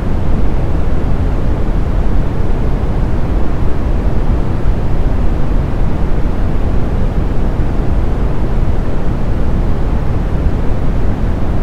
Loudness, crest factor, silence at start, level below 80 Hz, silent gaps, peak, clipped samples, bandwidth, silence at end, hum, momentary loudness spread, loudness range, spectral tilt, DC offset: -17 LUFS; 10 dB; 0 s; -14 dBFS; none; 0 dBFS; under 0.1%; 5.4 kHz; 0 s; none; 1 LU; 0 LU; -9 dB/octave; under 0.1%